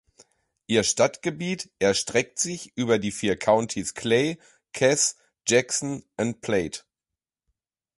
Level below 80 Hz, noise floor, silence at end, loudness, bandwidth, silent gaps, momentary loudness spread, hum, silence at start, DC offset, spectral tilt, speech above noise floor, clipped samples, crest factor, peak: -58 dBFS; -89 dBFS; 1.2 s; -24 LUFS; 11.5 kHz; none; 9 LU; none; 0.7 s; under 0.1%; -3.5 dB/octave; 65 dB; under 0.1%; 20 dB; -6 dBFS